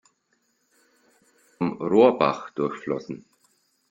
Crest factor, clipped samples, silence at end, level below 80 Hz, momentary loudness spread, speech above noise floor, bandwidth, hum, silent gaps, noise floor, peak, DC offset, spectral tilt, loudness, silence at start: 22 dB; under 0.1%; 0.75 s; -68 dBFS; 15 LU; 48 dB; 8.6 kHz; none; none; -71 dBFS; -4 dBFS; under 0.1%; -7 dB/octave; -23 LUFS; 1.6 s